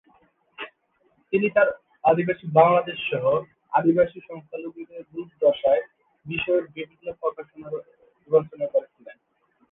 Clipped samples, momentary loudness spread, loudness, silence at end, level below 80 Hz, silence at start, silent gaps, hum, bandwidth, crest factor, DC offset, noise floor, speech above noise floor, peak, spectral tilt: under 0.1%; 18 LU; -23 LUFS; 0.6 s; -62 dBFS; 0.6 s; none; none; 3.9 kHz; 20 dB; under 0.1%; -67 dBFS; 44 dB; -4 dBFS; -9.5 dB/octave